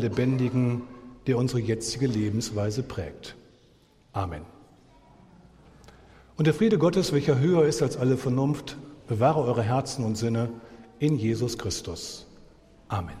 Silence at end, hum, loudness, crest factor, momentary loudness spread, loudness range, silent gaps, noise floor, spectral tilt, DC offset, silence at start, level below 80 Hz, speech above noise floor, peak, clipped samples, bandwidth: 0 s; none; -26 LUFS; 20 dB; 16 LU; 11 LU; none; -59 dBFS; -6.5 dB/octave; under 0.1%; 0 s; -54 dBFS; 34 dB; -8 dBFS; under 0.1%; 14 kHz